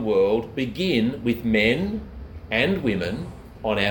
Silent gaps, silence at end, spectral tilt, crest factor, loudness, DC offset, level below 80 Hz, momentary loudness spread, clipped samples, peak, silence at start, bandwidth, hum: none; 0 s; -6.5 dB/octave; 18 dB; -23 LUFS; under 0.1%; -42 dBFS; 13 LU; under 0.1%; -6 dBFS; 0 s; 19 kHz; none